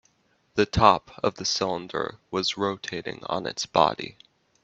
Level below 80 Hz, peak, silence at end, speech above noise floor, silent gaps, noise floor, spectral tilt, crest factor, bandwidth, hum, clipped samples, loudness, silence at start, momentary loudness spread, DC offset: -50 dBFS; -2 dBFS; 0.5 s; 41 dB; none; -67 dBFS; -4 dB/octave; 26 dB; 8.2 kHz; none; under 0.1%; -25 LUFS; 0.55 s; 13 LU; under 0.1%